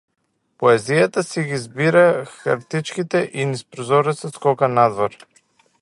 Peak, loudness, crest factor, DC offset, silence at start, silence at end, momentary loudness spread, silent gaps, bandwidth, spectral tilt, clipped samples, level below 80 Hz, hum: 0 dBFS; -19 LUFS; 18 dB; under 0.1%; 0.6 s; 0.7 s; 9 LU; none; 11.5 kHz; -5.5 dB/octave; under 0.1%; -64 dBFS; none